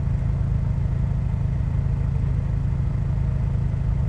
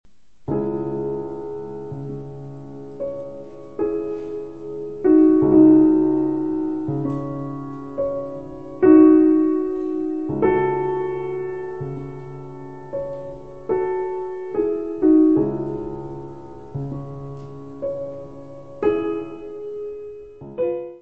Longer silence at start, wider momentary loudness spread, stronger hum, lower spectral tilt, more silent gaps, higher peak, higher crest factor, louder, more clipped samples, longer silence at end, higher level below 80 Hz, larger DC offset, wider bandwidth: second, 0 s vs 0.5 s; second, 1 LU vs 22 LU; neither; about the same, -10 dB/octave vs -10.5 dB/octave; neither; second, -12 dBFS vs -2 dBFS; second, 10 dB vs 18 dB; second, -24 LUFS vs -20 LUFS; neither; about the same, 0 s vs 0 s; first, -26 dBFS vs -52 dBFS; second, under 0.1% vs 0.7%; first, 5.8 kHz vs 3.3 kHz